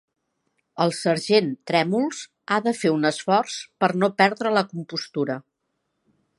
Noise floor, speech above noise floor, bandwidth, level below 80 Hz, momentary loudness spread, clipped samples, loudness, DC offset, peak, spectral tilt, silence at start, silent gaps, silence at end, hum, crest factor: -76 dBFS; 54 dB; 11.5 kHz; -74 dBFS; 10 LU; under 0.1%; -23 LUFS; under 0.1%; -2 dBFS; -5 dB/octave; 0.75 s; none; 1 s; none; 22 dB